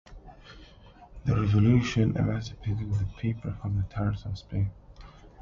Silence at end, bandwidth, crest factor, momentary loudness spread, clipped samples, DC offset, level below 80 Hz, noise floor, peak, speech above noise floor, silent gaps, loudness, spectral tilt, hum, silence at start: 0 s; 7.2 kHz; 18 dB; 11 LU; under 0.1%; under 0.1%; -42 dBFS; -51 dBFS; -10 dBFS; 25 dB; none; -28 LUFS; -7.5 dB/octave; none; 0.1 s